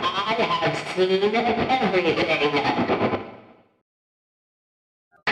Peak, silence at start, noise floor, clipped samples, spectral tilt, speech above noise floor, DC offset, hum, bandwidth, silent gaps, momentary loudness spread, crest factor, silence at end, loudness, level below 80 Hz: -10 dBFS; 0 s; -48 dBFS; under 0.1%; -5.5 dB/octave; 27 dB; under 0.1%; none; 11.5 kHz; 3.81-5.11 s; 5 LU; 14 dB; 0 s; -22 LUFS; -56 dBFS